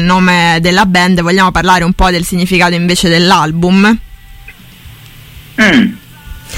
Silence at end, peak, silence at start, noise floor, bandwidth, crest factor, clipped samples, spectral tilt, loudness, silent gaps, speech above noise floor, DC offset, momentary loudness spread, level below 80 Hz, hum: 0 s; 0 dBFS; 0 s; -34 dBFS; 16.5 kHz; 10 dB; under 0.1%; -5 dB/octave; -9 LUFS; none; 25 dB; under 0.1%; 4 LU; -26 dBFS; none